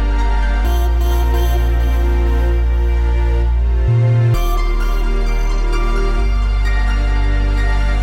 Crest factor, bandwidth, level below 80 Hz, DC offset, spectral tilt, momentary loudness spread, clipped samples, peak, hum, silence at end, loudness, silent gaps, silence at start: 8 dB; 16 kHz; -14 dBFS; 0.9%; -6.5 dB/octave; 5 LU; under 0.1%; -4 dBFS; none; 0 s; -17 LUFS; none; 0 s